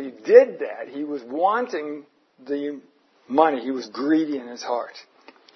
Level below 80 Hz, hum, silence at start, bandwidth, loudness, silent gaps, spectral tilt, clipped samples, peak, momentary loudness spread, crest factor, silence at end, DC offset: -82 dBFS; none; 0 s; 6.4 kHz; -22 LUFS; none; -5 dB/octave; under 0.1%; 0 dBFS; 17 LU; 22 dB; 0.55 s; under 0.1%